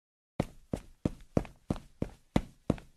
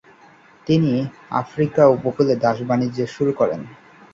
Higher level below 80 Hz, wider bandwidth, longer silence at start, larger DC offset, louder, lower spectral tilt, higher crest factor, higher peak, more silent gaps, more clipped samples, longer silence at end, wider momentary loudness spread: first, -46 dBFS vs -56 dBFS; first, 13.5 kHz vs 7.6 kHz; second, 0.4 s vs 0.65 s; neither; second, -37 LUFS vs -19 LUFS; about the same, -7.5 dB/octave vs -8 dB/octave; first, 28 dB vs 18 dB; second, -8 dBFS vs -2 dBFS; neither; neither; second, 0.15 s vs 0.4 s; about the same, 8 LU vs 10 LU